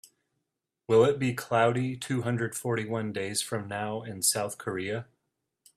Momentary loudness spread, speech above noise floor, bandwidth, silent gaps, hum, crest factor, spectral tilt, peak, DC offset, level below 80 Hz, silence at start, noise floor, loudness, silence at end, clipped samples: 10 LU; 56 dB; 15 kHz; none; none; 20 dB; -4.5 dB/octave; -10 dBFS; under 0.1%; -68 dBFS; 0.9 s; -84 dBFS; -29 LUFS; 0.75 s; under 0.1%